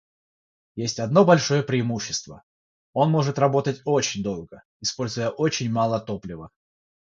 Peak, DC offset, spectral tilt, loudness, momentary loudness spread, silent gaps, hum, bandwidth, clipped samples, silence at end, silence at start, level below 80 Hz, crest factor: -4 dBFS; under 0.1%; -5 dB/octave; -23 LUFS; 14 LU; 2.43-2.93 s, 4.65-4.80 s; none; 7.8 kHz; under 0.1%; 0.6 s; 0.75 s; -58 dBFS; 20 dB